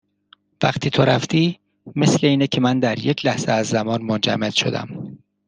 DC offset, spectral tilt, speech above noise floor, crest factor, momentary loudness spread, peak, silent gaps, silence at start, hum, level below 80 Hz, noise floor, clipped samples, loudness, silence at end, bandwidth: under 0.1%; -5 dB/octave; 37 dB; 18 dB; 12 LU; -2 dBFS; none; 0.6 s; none; -56 dBFS; -56 dBFS; under 0.1%; -19 LUFS; 0.3 s; 10 kHz